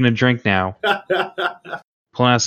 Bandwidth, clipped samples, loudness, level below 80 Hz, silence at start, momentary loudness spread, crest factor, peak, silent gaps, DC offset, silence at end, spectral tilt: 12.5 kHz; under 0.1%; -19 LUFS; -60 dBFS; 0 s; 17 LU; 18 dB; 0 dBFS; 1.84-2.05 s; under 0.1%; 0 s; -4.5 dB/octave